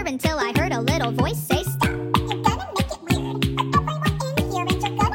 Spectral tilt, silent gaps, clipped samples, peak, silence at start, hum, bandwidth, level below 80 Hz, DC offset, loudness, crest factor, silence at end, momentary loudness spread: -5.5 dB/octave; none; under 0.1%; -2 dBFS; 0 s; none; 17 kHz; -36 dBFS; under 0.1%; -23 LUFS; 20 dB; 0 s; 3 LU